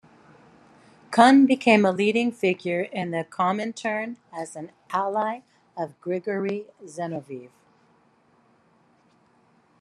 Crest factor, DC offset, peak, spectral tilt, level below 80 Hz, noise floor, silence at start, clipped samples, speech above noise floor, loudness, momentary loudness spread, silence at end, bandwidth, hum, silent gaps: 24 dB; under 0.1%; -2 dBFS; -5.5 dB/octave; -76 dBFS; -62 dBFS; 1.1 s; under 0.1%; 39 dB; -23 LUFS; 19 LU; 2.35 s; 11 kHz; none; none